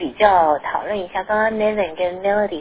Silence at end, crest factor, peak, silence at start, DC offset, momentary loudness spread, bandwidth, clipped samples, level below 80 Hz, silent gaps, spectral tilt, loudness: 0 s; 18 dB; 0 dBFS; 0 s; under 0.1%; 9 LU; 4 kHz; under 0.1%; -48 dBFS; none; -8.5 dB/octave; -19 LUFS